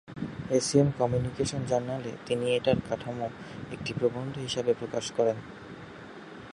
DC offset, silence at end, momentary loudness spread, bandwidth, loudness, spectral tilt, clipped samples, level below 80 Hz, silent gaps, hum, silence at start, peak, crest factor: under 0.1%; 0 s; 19 LU; 11.5 kHz; -29 LUFS; -5.5 dB/octave; under 0.1%; -56 dBFS; none; none; 0.05 s; -10 dBFS; 20 dB